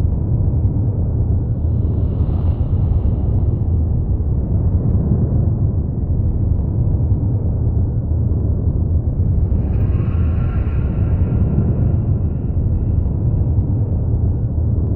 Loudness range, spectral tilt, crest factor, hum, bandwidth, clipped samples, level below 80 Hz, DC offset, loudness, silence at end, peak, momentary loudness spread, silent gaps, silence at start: 1 LU; -14 dB/octave; 12 dB; none; 2.9 kHz; under 0.1%; -20 dBFS; under 0.1%; -18 LUFS; 0 s; -4 dBFS; 2 LU; none; 0 s